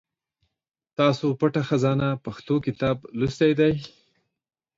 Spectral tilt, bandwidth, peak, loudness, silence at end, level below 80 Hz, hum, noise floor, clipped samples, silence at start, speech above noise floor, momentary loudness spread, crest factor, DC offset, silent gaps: -7.5 dB/octave; 7.8 kHz; -6 dBFS; -24 LUFS; 0.9 s; -54 dBFS; none; -75 dBFS; under 0.1%; 1 s; 52 dB; 10 LU; 18 dB; under 0.1%; none